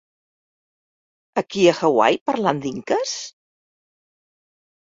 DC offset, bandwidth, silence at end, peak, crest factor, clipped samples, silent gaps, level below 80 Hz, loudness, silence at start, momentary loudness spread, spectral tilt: under 0.1%; 7.8 kHz; 1.55 s; -2 dBFS; 22 dB; under 0.1%; 2.21-2.26 s; -64 dBFS; -20 LUFS; 1.35 s; 11 LU; -4.5 dB/octave